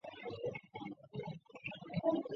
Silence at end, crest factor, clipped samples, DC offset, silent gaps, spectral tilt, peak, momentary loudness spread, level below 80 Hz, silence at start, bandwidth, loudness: 0 s; 22 dB; under 0.1%; under 0.1%; none; -5.5 dB/octave; -20 dBFS; 13 LU; -74 dBFS; 0.05 s; 7 kHz; -43 LUFS